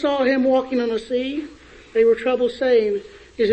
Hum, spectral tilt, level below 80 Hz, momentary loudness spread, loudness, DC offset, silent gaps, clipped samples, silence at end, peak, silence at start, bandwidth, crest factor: none; -5.5 dB/octave; -54 dBFS; 11 LU; -20 LUFS; under 0.1%; none; under 0.1%; 0 s; -6 dBFS; 0 s; 8.6 kHz; 14 dB